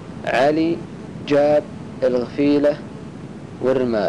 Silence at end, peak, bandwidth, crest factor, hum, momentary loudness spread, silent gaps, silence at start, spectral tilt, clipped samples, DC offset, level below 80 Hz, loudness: 0 s; -10 dBFS; 10.5 kHz; 10 dB; none; 18 LU; none; 0 s; -7 dB/octave; under 0.1%; 0.3%; -52 dBFS; -19 LUFS